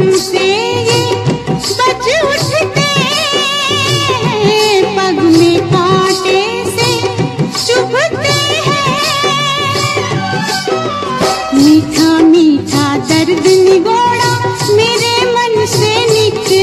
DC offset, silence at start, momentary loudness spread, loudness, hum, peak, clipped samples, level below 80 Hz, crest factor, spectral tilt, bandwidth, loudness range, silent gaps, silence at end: under 0.1%; 0 s; 6 LU; -10 LUFS; none; 0 dBFS; under 0.1%; -42 dBFS; 10 dB; -4 dB/octave; 13.5 kHz; 3 LU; none; 0 s